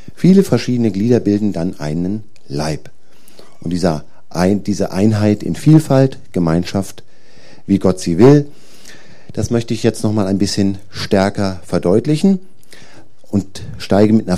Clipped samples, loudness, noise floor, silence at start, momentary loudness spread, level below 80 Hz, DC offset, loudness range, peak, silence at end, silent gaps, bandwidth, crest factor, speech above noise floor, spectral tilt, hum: under 0.1%; -15 LUFS; -46 dBFS; 0.2 s; 14 LU; -44 dBFS; 4%; 4 LU; 0 dBFS; 0 s; none; 14.5 kHz; 16 dB; 32 dB; -7 dB/octave; none